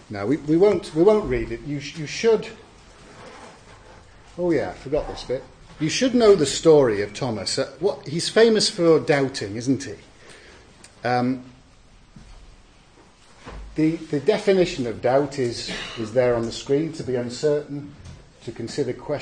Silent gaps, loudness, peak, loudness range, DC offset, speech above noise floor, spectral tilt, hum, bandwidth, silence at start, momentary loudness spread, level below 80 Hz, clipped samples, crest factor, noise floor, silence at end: none; -22 LUFS; -4 dBFS; 10 LU; under 0.1%; 30 dB; -5 dB/octave; none; 9.8 kHz; 0.1 s; 16 LU; -48 dBFS; under 0.1%; 20 dB; -52 dBFS; 0 s